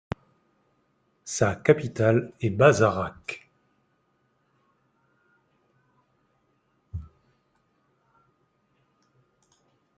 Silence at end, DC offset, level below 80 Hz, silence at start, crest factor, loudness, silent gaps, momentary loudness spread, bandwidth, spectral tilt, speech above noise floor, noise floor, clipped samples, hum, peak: 2.95 s; under 0.1%; -58 dBFS; 1.25 s; 26 dB; -23 LUFS; none; 22 LU; 9.4 kHz; -6 dB/octave; 48 dB; -70 dBFS; under 0.1%; none; -4 dBFS